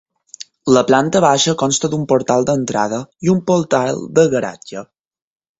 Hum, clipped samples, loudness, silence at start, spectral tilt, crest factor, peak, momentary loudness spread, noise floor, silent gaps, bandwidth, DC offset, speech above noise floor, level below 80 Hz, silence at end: none; under 0.1%; -16 LUFS; 0.65 s; -4.5 dB/octave; 16 dB; 0 dBFS; 16 LU; -39 dBFS; none; 8 kHz; under 0.1%; 24 dB; -54 dBFS; 0.75 s